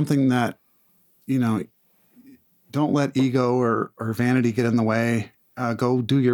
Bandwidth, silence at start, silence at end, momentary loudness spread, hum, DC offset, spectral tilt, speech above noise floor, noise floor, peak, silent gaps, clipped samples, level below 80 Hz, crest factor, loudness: 19 kHz; 0 s; 0 s; 8 LU; none; under 0.1%; -7 dB/octave; 41 dB; -62 dBFS; -6 dBFS; none; under 0.1%; -66 dBFS; 16 dB; -23 LUFS